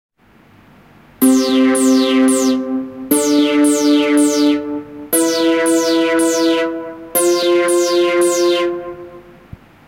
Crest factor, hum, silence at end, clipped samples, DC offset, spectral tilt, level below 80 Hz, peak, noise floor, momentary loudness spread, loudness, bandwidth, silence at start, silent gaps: 14 dB; none; 0.65 s; under 0.1%; under 0.1%; -2.5 dB/octave; -56 dBFS; -2 dBFS; -48 dBFS; 10 LU; -14 LUFS; 16 kHz; 1.2 s; none